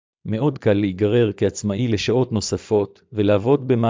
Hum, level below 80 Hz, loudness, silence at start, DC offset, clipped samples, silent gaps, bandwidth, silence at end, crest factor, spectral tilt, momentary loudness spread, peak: none; -46 dBFS; -20 LUFS; 0.25 s; under 0.1%; under 0.1%; none; 7.6 kHz; 0 s; 14 dB; -6.5 dB/octave; 5 LU; -4 dBFS